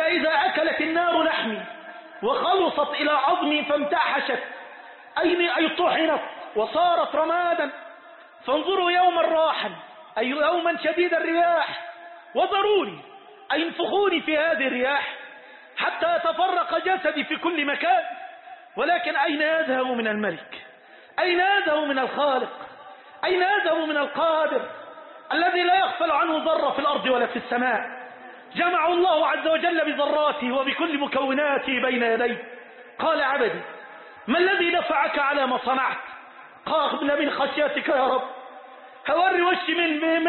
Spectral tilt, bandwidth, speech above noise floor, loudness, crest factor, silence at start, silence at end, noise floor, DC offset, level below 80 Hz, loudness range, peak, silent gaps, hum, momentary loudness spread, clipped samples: -8 dB/octave; 4.4 kHz; 26 dB; -23 LUFS; 14 dB; 0 s; 0 s; -49 dBFS; under 0.1%; -68 dBFS; 2 LU; -8 dBFS; none; none; 17 LU; under 0.1%